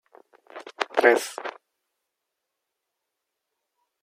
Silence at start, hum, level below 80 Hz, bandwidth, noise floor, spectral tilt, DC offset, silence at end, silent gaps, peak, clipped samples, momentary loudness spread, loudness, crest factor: 0.55 s; none; -88 dBFS; 16 kHz; -83 dBFS; -1.5 dB/octave; under 0.1%; 2.55 s; none; -2 dBFS; under 0.1%; 23 LU; -23 LUFS; 26 dB